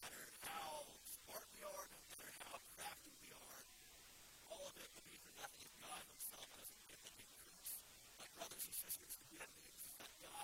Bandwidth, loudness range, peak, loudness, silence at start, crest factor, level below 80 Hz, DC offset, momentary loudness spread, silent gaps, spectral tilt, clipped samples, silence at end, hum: 16.5 kHz; 4 LU; -34 dBFS; -54 LUFS; 0 s; 24 dB; -80 dBFS; under 0.1%; 10 LU; none; -0.5 dB/octave; under 0.1%; 0 s; none